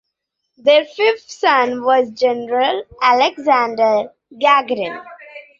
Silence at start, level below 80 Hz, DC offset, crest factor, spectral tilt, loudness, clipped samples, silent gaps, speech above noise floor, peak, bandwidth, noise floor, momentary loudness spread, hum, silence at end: 0.65 s; -62 dBFS; under 0.1%; 16 dB; -3 dB/octave; -16 LUFS; under 0.1%; none; 60 dB; 0 dBFS; 7.6 kHz; -76 dBFS; 10 LU; none; 0.2 s